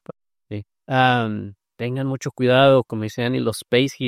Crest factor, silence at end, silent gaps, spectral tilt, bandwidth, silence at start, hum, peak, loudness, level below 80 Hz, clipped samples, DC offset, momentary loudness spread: 18 dB; 0 s; none; -6 dB/octave; 15 kHz; 0.1 s; none; -2 dBFS; -20 LUFS; -60 dBFS; under 0.1%; under 0.1%; 19 LU